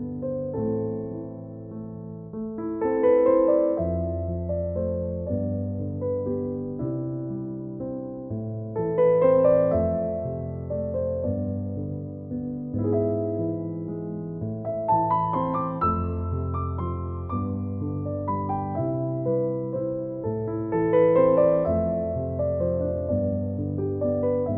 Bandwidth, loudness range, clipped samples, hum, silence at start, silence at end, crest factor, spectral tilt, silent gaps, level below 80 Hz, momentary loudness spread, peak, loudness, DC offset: 3.4 kHz; 6 LU; under 0.1%; none; 0 s; 0 s; 16 dB; -10.5 dB/octave; none; -46 dBFS; 13 LU; -8 dBFS; -26 LUFS; under 0.1%